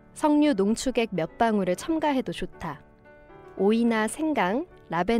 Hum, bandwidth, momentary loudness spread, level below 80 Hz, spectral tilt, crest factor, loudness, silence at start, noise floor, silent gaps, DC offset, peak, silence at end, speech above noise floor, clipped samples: none; 15 kHz; 13 LU; -50 dBFS; -5.5 dB/octave; 14 dB; -25 LUFS; 0.15 s; -51 dBFS; none; under 0.1%; -10 dBFS; 0 s; 27 dB; under 0.1%